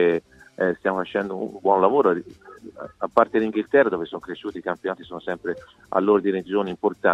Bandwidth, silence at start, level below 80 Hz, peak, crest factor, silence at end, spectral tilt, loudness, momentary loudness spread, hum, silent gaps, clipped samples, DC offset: 7.6 kHz; 0 s; -62 dBFS; -2 dBFS; 20 dB; 0 s; -7.5 dB/octave; -23 LUFS; 13 LU; none; none; under 0.1%; under 0.1%